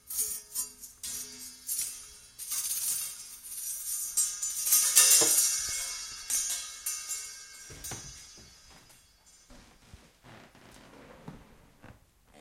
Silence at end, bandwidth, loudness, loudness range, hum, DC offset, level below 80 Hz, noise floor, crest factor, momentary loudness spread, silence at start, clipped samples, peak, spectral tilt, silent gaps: 0 s; 16 kHz; -27 LUFS; 19 LU; none; under 0.1%; -64 dBFS; -60 dBFS; 28 dB; 23 LU; 0.05 s; under 0.1%; -4 dBFS; 1 dB/octave; none